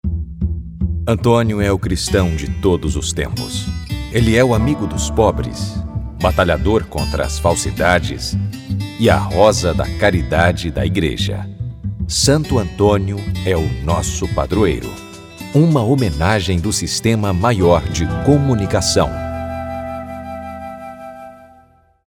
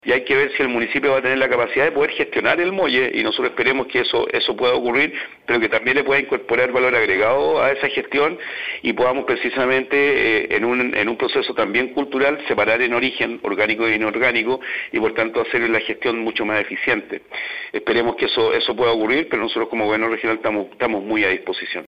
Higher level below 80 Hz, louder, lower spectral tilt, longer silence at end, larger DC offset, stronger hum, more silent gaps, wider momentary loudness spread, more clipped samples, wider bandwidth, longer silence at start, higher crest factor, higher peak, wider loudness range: first, -28 dBFS vs -56 dBFS; about the same, -17 LUFS vs -19 LUFS; about the same, -5.5 dB/octave vs -6 dB/octave; first, 0.7 s vs 0 s; second, under 0.1% vs 0.2%; neither; neither; first, 12 LU vs 6 LU; neither; first, 17 kHz vs 6.6 kHz; about the same, 0.05 s vs 0.05 s; about the same, 16 dB vs 18 dB; about the same, 0 dBFS vs -2 dBFS; about the same, 2 LU vs 2 LU